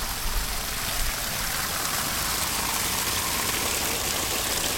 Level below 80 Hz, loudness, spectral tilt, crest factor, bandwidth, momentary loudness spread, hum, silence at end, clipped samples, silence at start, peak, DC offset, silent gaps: -36 dBFS; -25 LUFS; -1 dB/octave; 18 dB; 17.5 kHz; 4 LU; none; 0 s; under 0.1%; 0 s; -8 dBFS; under 0.1%; none